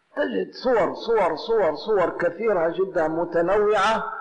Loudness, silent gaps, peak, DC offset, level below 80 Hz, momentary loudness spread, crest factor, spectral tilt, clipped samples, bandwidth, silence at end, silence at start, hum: -22 LUFS; none; -14 dBFS; under 0.1%; -52 dBFS; 5 LU; 8 dB; -5.5 dB/octave; under 0.1%; 9.4 kHz; 0 s; 0.15 s; none